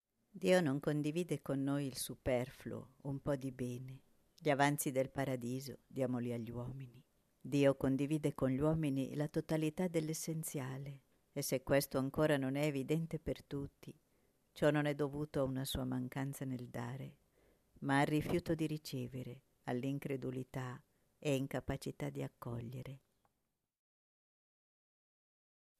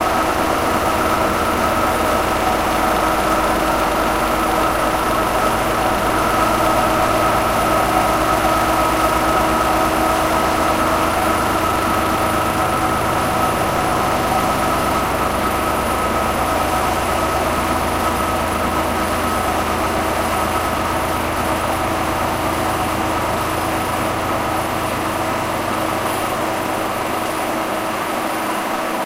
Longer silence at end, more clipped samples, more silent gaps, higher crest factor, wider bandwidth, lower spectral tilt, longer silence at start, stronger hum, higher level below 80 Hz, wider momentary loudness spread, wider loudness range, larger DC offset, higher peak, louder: first, 2.85 s vs 0 s; neither; neither; first, 20 dB vs 14 dB; second, 14 kHz vs 16 kHz; first, -6 dB/octave vs -4 dB/octave; first, 0.35 s vs 0 s; neither; second, -62 dBFS vs -34 dBFS; first, 15 LU vs 4 LU; about the same, 6 LU vs 4 LU; neither; second, -18 dBFS vs -2 dBFS; second, -39 LUFS vs -18 LUFS